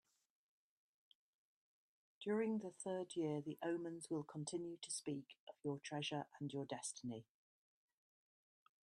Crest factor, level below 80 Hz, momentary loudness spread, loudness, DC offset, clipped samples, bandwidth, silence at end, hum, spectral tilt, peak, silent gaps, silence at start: 18 dB; -90 dBFS; 8 LU; -46 LUFS; under 0.1%; under 0.1%; 12 kHz; 1.6 s; none; -4.5 dB/octave; -30 dBFS; 5.40-5.47 s; 2.2 s